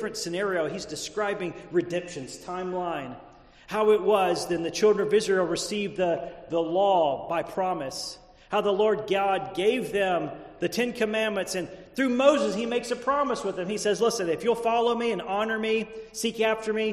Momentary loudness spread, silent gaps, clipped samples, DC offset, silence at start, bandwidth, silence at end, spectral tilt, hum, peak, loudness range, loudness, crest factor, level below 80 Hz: 11 LU; none; under 0.1%; under 0.1%; 0 s; 13 kHz; 0 s; -4 dB/octave; none; -6 dBFS; 3 LU; -26 LUFS; 20 dB; -60 dBFS